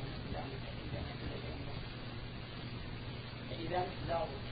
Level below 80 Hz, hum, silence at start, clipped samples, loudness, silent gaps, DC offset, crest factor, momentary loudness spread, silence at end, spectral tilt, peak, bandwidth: -50 dBFS; none; 0 s; under 0.1%; -42 LUFS; none; under 0.1%; 18 dB; 7 LU; 0 s; -4.5 dB/octave; -24 dBFS; 4.9 kHz